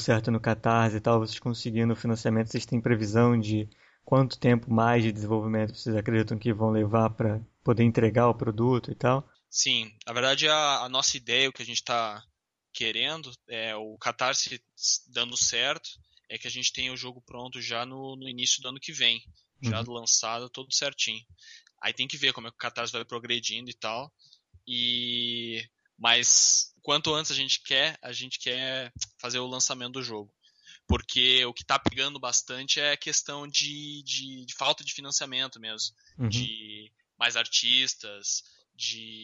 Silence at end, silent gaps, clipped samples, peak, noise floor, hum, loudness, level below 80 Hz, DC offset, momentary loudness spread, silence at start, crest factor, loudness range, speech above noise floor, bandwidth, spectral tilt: 0 s; none; under 0.1%; -6 dBFS; -56 dBFS; none; -26 LUFS; -54 dBFS; under 0.1%; 12 LU; 0 s; 22 dB; 6 LU; 28 dB; 8 kHz; -3 dB/octave